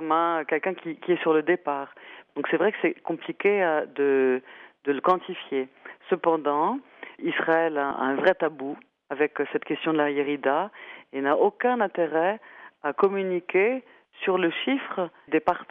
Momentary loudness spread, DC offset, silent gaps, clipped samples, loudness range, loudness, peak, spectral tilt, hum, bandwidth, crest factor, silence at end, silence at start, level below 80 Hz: 11 LU; under 0.1%; none; under 0.1%; 1 LU; -25 LUFS; -8 dBFS; -3 dB/octave; none; 5 kHz; 18 dB; 0.05 s; 0 s; -74 dBFS